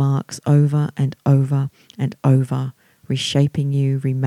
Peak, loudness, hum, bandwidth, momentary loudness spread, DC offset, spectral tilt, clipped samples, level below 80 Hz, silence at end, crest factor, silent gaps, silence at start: -4 dBFS; -19 LUFS; none; 11.5 kHz; 10 LU; under 0.1%; -7 dB/octave; under 0.1%; -58 dBFS; 0 s; 14 dB; none; 0 s